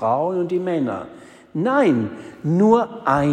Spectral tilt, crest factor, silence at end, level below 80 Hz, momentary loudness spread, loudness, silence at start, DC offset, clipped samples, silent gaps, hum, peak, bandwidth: -8 dB/octave; 16 dB; 0 s; -56 dBFS; 14 LU; -20 LUFS; 0 s; under 0.1%; under 0.1%; none; none; -4 dBFS; 9.8 kHz